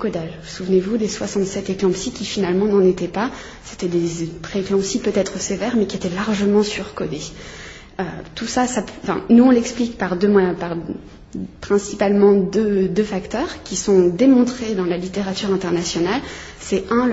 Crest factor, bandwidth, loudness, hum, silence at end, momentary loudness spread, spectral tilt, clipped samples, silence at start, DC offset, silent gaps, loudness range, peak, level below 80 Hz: 16 dB; 8 kHz; -19 LUFS; none; 0 s; 15 LU; -5.5 dB/octave; under 0.1%; 0 s; under 0.1%; none; 5 LU; -2 dBFS; -44 dBFS